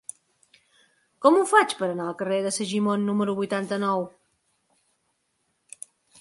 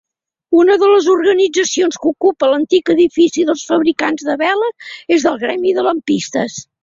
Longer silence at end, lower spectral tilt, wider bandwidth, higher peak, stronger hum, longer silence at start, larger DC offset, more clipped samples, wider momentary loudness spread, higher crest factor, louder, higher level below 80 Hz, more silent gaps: first, 2.1 s vs 0.2 s; about the same, -4.5 dB/octave vs -3.5 dB/octave; first, 11.5 kHz vs 7.8 kHz; second, -4 dBFS vs 0 dBFS; neither; first, 1.2 s vs 0.5 s; neither; neither; first, 22 LU vs 7 LU; first, 22 dB vs 14 dB; second, -24 LUFS vs -14 LUFS; second, -74 dBFS vs -58 dBFS; neither